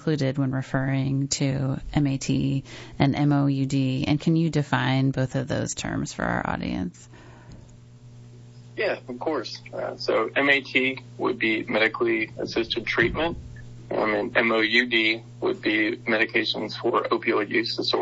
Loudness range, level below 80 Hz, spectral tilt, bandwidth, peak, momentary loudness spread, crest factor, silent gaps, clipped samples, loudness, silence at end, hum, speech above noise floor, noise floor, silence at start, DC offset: 8 LU; -48 dBFS; -5.5 dB/octave; 8 kHz; -4 dBFS; 9 LU; 22 dB; none; under 0.1%; -24 LUFS; 0 s; none; 23 dB; -47 dBFS; 0 s; under 0.1%